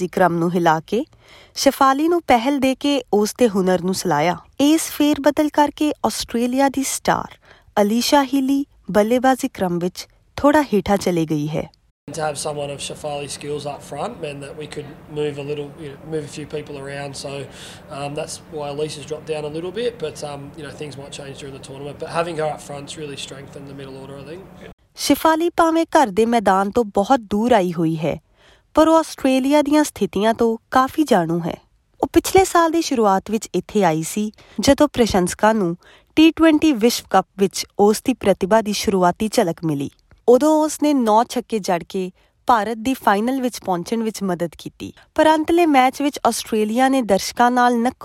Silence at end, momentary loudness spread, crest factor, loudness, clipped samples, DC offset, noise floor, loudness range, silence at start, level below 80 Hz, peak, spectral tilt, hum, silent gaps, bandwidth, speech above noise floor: 0 s; 17 LU; 16 dB; -19 LUFS; under 0.1%; under 0.1%; -49 dBFS; 11 LU; 0 s; -48 dBFS; -2 dBFS; -4.5 dB/octave; none; 11.91-12.07 s, 24.73-24.78 s; 16.5 kHz; 30 dB